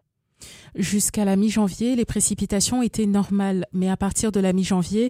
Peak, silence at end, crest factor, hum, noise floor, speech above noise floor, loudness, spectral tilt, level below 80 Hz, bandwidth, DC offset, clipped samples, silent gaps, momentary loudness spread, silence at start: -8 dBFS; 0 s; 14 dB; none; -49 dBFS; 28 dB; -22 LUFS; -5 dB/octave; -44 dBFS; 16 kHz; under 0.1%; under 0.1%; none; 4 LU; 0.4 s